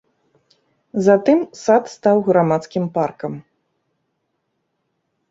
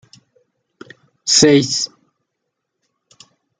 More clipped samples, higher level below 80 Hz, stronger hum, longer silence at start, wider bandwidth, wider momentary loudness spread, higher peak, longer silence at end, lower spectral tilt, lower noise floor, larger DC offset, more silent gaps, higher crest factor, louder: neither; about the same, -64 dBFS vs -60 dBFS; neither; second, 0.95 s vs 1.25 s; second, 8 kHz vs 10 kHz; about the same, 14 LU vs 15 LU; about the same, -2 dBFS vs 0 dBFS; first, 1.9 s vs 1.75 s; first, -7 dB/octave vs -3 dB/octave; second, -72 dBFS vs -76 dBFS; neither; neither; about the same, 18 dB vs 20 dB; second, -17 LUFS vs -14 LUFS